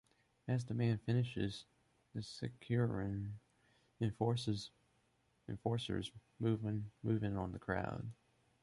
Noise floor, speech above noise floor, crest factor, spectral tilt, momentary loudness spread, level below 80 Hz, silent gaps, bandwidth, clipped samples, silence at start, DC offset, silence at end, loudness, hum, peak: -77 dBFS; 38 dB; 18 dB; -7 dB/octave; 13 LU; -62 dBFS; none; 11.5 kHz; under 0.1%; 0.45 s; under 0.1%; 0.5 s; -40 LUFS; none; -22 dBFS